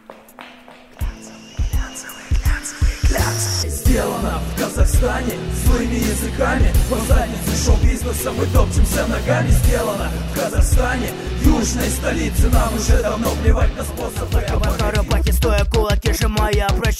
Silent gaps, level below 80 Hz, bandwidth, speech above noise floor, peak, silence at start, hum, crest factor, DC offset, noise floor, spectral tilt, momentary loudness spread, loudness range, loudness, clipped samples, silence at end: none; -20 dBFS; 16 kHz; 25 dB; -2 dBFS; 0.1 s; none; 14 dB; under 0.1%; -42 dBFS; -5 dB/octave; 8 LU; 3 LU; -19 LUFS; under 0.1%; 0 s